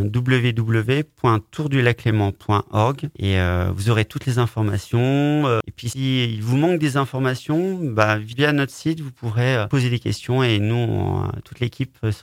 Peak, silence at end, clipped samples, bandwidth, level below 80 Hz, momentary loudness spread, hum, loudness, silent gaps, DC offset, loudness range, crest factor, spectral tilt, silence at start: 0 dBFS; 0 s; under 0.1%; 15.5 kHz; -48 dBFS; 7 LU; none; -21 LUFS; none; under 0.1%; 1 LU; 20 dB; -6.5 dB/octave; 0 s